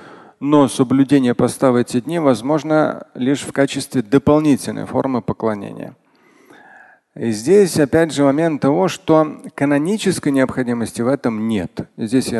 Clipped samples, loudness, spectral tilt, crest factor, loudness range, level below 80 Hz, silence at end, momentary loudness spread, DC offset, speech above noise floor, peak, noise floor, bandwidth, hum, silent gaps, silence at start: under 0.1%; -17 LUFS; -6 dB/octave; 16 dB; 4 LU; -50 dBFS; 0 s; 9 LU; under 0.1%; 34 dB; 0 dBFS; -50 dBFS; 12.5 kHz; none; none; 0 s